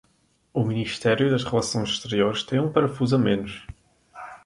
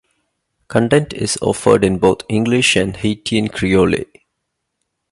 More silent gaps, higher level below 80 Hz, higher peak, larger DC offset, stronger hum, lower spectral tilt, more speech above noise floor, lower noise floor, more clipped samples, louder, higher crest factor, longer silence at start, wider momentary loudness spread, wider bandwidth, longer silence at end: neither; second, -54 dBFS vs -42 dBFS; second, -4 dBFS vs 0 dBFS; neither; neither; about the same, -5.5 dB/octave vs -5 dB/octave; second, 42 dB vs 59 dB; second, -65 dBFS vs -74 dBFS; neither; second, -24 LUFS vs -16 LUFS; about the same, 20 dB vs 16 dB; second, 0.55 s vs 0.7 s; first, 12 LU vs 7 LU; about the same, 11.5 kHz vs 11.5 kHz; second, 0.1 s vs 1.05 s